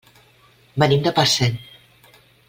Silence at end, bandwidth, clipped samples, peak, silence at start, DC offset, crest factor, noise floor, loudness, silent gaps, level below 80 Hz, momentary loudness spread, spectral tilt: 0.85 s; 16.5 kHz; under 0.1%; 0 dBFS; 0.75 s; under 0.1%; 22 dB; -54 dBFS; -18 LUFS; none; -52 dBFS; 14 LU; -4.5 dB/octave